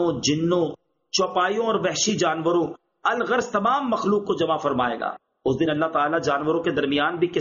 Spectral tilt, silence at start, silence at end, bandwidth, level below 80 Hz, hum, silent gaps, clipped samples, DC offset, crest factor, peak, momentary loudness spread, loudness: -3.5 dB/octave; 0 s; 0 s; 7.2 kHz; -58 dBFS; none; none; under 0.1%; under 0.1%; 14 dB; -8 dBFS; 5 LU; -23 LUFS